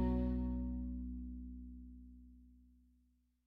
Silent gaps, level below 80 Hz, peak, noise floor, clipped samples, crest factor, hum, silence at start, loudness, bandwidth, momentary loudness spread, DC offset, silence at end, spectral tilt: none; -46 dBFS; -26 dBFS; -76 dBFS; under 0.1%; 16 dB; none; 0 s; -43 LUFS; 4.3 kHz; 23 LU; under 0.1%; 0.8 s; -11 dB/octave